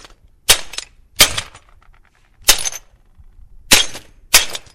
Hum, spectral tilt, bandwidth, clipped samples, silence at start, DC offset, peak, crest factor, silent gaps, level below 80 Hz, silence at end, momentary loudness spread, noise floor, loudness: none; 0.5 dB/octave; over 20 kHz; 0.2%; 0.5 s; under 0.1%; 0 dBFS; 18 dB; none; -36 dBFS; 0.15 s; 18 LU; -50 dBFS; -14 LUFS